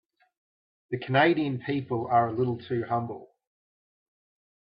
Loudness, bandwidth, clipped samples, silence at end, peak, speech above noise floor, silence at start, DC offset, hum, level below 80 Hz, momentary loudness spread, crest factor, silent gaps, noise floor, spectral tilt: -27 LUFS; 5.2 kHz; under 0.1%; 1.5 s; -10 dBFS; over 64 dB; 0.9 s; under 0.1%; none; -70 dBFS; 14 LU; 20 dB; none; under -90 dBFS; -10.5 dB/octave